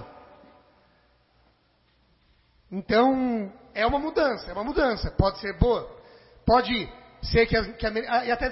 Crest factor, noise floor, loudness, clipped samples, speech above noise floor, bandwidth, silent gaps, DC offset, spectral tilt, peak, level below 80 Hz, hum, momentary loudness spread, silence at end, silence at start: 20 dB; -65 dBFS; -25 LUFS; under 0.1%; 41 dB; 5.8 kHz; none; under 0.1%; -9.5 dB/octave; -6 dBFS; -38 dBFS; none; 14 LU; 0 s; 0 s